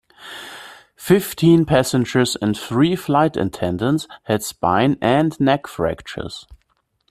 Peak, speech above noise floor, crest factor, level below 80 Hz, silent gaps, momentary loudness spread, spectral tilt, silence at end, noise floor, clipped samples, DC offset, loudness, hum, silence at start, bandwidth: -2 dBFS; 48 dB; 16 dB; -48 dBFS; none; 18 LU; -6 dB/octave; 0.55 s; -66 dBFS; under 0.1%; under 0.1%; -18 LUFS; none; 0.2 s; 15.5 kHz